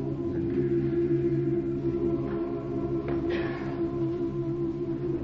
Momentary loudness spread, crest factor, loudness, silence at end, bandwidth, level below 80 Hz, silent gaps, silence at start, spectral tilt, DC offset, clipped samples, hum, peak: 5 LU; 12 dB; -29 LUFS; 0 s; 5.6 kHz; -48 dBFS; none; 0 s; -10 dB/octave; under 0.1%; under 0.1%; none; -16 dBFS